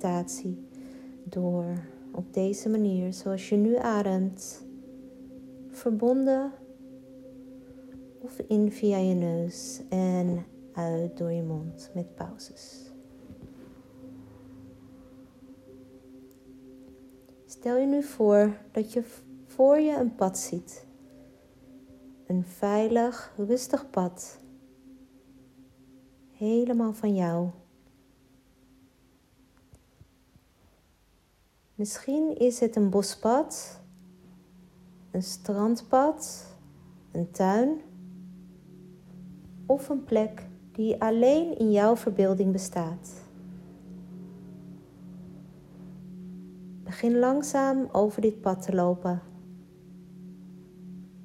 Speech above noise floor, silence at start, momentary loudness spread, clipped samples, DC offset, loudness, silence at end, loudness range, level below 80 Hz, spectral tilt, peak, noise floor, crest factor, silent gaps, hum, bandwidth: 38 dB; 0 s; 24 LU; under 0.1%; under 0.1%; -27 LUFS; 0 s; 12 LU; -64 dBFS; -6.5 dB/octave; -10 dBFS; -65 dBFS; 20 dB; none; none; 15.5 kHz